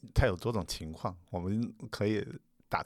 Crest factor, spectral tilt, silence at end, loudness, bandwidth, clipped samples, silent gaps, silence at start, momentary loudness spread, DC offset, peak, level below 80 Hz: 22 dB; -6 dB/octave; 0 s; -35 LUFS; 14.5 kHz; under 0.1%; none; 0.05 s; 10 LU; under 0.1%; -12 dBFS; -44 dBFS